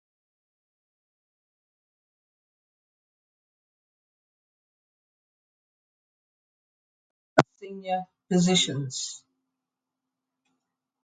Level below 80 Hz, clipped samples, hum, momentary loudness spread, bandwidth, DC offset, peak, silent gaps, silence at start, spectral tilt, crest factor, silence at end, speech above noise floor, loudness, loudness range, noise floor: -68 dBFS; under 0.1%; none; 14 LU; 9.4 kHz; under 0.1%; 0 dBFS; none; 7.35 s; -4 dB/octave; 34 dB; 1.85 s; 60 dB; -26 LUFS; 6 LU; -87 dBFS